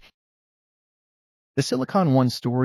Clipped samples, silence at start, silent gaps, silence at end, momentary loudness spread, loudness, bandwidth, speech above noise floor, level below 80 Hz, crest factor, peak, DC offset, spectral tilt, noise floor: under 0.1%; 1.55 s; none; 0 s; 8 LU; -22 LUFS; 12.5 kHz; over 69 dB; -68 dBFS; 18 dB; -8 dBFS; under 0.1%; -6.5 dB/octave; under -90 dBFS